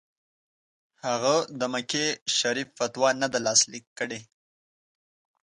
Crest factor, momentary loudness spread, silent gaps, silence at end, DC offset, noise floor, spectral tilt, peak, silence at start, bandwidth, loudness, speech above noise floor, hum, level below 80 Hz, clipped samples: 22 dB; 12 LU; 2.21-2.26 s, 3.87-3.96 s; 1.2 s; under 0.1%; under -90 dBFS; -1.5 dB/octave; -8 dBFS; 1.05 s; 11.5 kHz; -25 LUFS; over 63 dB; none; -74 dBFS; under 0.1%